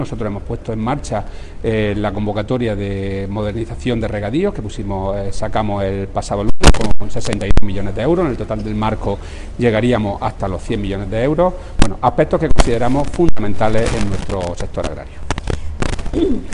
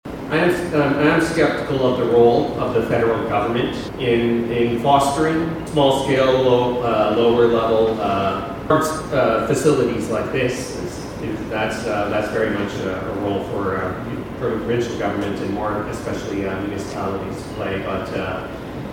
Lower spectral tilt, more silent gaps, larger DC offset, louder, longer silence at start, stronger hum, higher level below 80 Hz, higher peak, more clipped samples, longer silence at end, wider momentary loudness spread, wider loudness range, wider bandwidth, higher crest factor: about the same, -6 dB/octave vs -6 dB/octave; neither; neither; about the same, -19 LUFS vs -20 LUFS; about the same, 0 s vs 0.05 s; neither; first, -22 dBFS vs -42 dBFS; about the same, 0 dBFS vs -2 dBFS; neither; about the same, 0 s vs 0 s; about the same, 9 LU vs 10 LU; second, 4 LU vs 7 LU; second, 11 kHz vs 17 kHz; about the same, 14 dB vs 16 dB